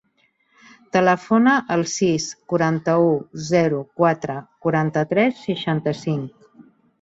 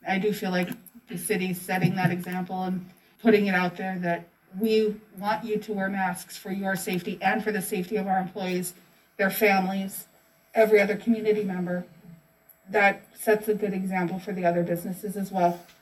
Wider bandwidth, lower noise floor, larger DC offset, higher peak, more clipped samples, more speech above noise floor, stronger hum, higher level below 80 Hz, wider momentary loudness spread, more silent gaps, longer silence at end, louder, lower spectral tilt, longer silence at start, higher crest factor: second, 8 kHz vs 16 kHz; first, -65 dBFS vs -58 dBFS; neither; first, -4 dBFS vs -8 dBFS; neither; first, 45 dB vs 32 dB; neither; first, -60 dBFS vs -68 dBFS; about the same, 9 LU vs 11 LU; neither; first, 0.4 s vs 0.2 s; first, -20 LUFS vs -26 LUFS; about the same, -5.5 dB/octave vs -5.5 dB/octave; first, 0.95 s vs 0.05 s; about the same, 18 dB vs 20 dB